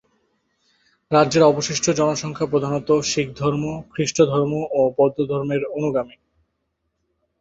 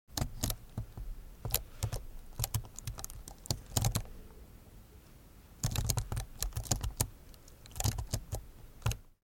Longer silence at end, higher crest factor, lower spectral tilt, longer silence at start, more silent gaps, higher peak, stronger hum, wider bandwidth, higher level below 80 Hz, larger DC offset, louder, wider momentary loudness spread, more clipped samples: first, 1.3 s vs 0.1 s; second, 20 dB vs 30 dB; first, -5 dB/octave vs -3.5 dB/octave; first, 1.1 s vs 0.1 s; neither; first, -2 dBFS vs -10 dBFS; neither; second, 8 kHz vs 17 kHz; second, -56 dBFS vs -44 dBFS; neither; first, -20 LUFS vs -38 LUFS; second, 8 LU vs 22 LU; neither